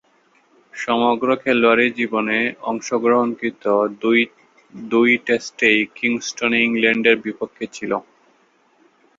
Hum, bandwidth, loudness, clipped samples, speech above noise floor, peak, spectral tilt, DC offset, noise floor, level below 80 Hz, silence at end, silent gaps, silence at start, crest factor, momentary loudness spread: none; 7.8 kHz; -18 LUFS; under 0.1%; 40 dB; 0 dBFS; -4 dB/octave; under 0.1%; -58 dBFS; -64 dBFS; 1.15 s; none; 0.75 s; 18 dB; 11 LU